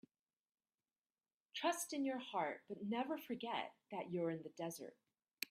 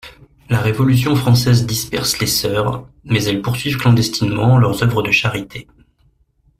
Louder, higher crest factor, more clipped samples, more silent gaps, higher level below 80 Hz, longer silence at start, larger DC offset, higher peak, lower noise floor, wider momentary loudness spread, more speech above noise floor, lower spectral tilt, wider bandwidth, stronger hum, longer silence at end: second, -44 LUFS vs -16 LUFS; first, 24 dB vs 16 dB; neither; neither; second, under -90 dBFS vs -42 dBFS; first, 1.55 s vs 0.05 s; neither; second, -22 dBFS vs 0 dBFS; first, under -90 dBFS vs -58 dBFS; about the same, 9 LU vs 8 LU; first, over 46 dB vs 42 dB; about the same, -4 dB/octave vs -5 dB/octave; about the same, 15.5 kHz vs 16 kHz; neither; second, 0.05 s vs 1 s